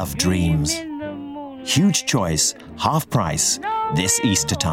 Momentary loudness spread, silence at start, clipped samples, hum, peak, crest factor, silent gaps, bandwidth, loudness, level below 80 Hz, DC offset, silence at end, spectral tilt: 13 LU; 0 s; under 0.1%; none; -4 dBFS; 16 dB; none; 17.5 kHz; -19 LUFS; -40 dBFS; under 0.1%; 0 s; -3.5 dB/octave